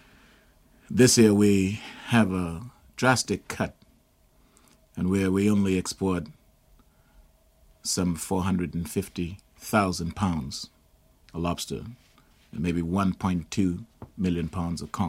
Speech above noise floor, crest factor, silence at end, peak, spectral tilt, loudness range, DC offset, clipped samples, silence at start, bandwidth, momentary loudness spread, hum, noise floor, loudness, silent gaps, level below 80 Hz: 37 dB; 22 dB; 0 s; -6 dBFS; -5 dB/octave; 8 LU; under 0.1%; under 0.1%; 0.9 s; 16 kHz; 16 LU; none; -62 dBFS; -26 LUFS; none; -50 dBFS